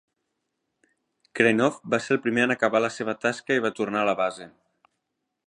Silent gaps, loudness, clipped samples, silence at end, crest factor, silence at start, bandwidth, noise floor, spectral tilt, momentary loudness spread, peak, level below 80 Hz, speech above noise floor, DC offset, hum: none; -24 LUFS; under 0.1%; 1 s; 22 dB; 1.35 s; 11 kHz; -80 dBFS; -5 dB/octave; 7 LU; -4 dBFS; -72 dBFS; 56 dB; under 0.1%; none